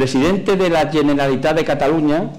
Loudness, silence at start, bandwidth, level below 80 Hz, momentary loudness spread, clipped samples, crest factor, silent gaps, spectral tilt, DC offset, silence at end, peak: -16 LUFS; 0 s; 15.5 kHz; -40 dBFS; 1 LU; under 0.1%; 6 dB; none; -6 dB/octave; 0.6%; 0 s; -10 dBFS